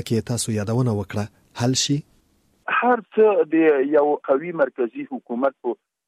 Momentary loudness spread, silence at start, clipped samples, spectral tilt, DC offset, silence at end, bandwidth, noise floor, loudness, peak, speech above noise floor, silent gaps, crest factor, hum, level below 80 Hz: 12 LU; 0 s; under 0.1%; -5 dB/octave; under 0.1%; 0.35 s; 15 kHz; -62 dBFS; -21 LUFS; -6 dBFS; 41 dB; none; 16 dB; none; -60 dBFS